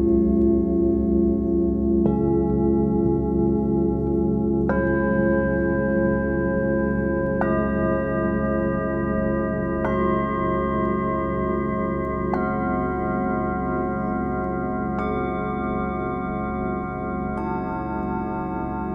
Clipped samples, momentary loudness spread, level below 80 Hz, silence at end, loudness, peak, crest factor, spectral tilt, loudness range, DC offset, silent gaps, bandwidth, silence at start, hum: under 0.1%; 6 LU; -34 dBFS; 0 s; -23 LUFS; -8 dBFS; 14 dB; -11 dB/octave; 5 LU; under 0.1%; none; 3.7 kHz; 0 s; none